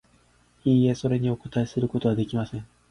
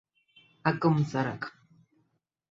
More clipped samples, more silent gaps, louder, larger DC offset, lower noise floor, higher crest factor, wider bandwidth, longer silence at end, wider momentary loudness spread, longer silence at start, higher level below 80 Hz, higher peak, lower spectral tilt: neither; neither; first, -25 LUFS vs -29 LUFS; neither; second, -61 dBFS vs -75 dBFS; second, 16 dB vs 22 dB; first, 10.5 kHz vs 7.6 kHz; second, 0.25 s vs 1 s; second, 9 LU vs 13 LU; about the same, 0.65 s vs 0.65 s; first, -54 dBFS vs -68 dBFS; about the same, -10 dBFS vs -10 dBFS; about the same, -8 dB/octave vs -7.5 dB/octave